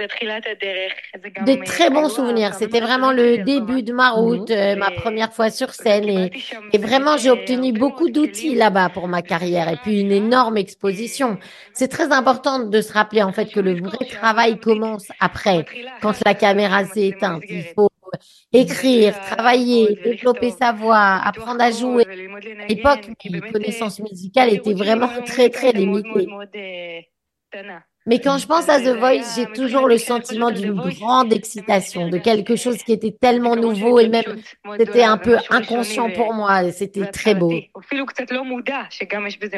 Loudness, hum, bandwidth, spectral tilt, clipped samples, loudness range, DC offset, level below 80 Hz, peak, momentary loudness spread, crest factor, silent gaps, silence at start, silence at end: -18 LUFS; none; 12.5 kHz; -5 dB/octave; under 0.1%; 3 LU; under 0.1%; -56 dBFS; 0 dBFS; 11 LU; 18 dB; none; 0 s; 0 s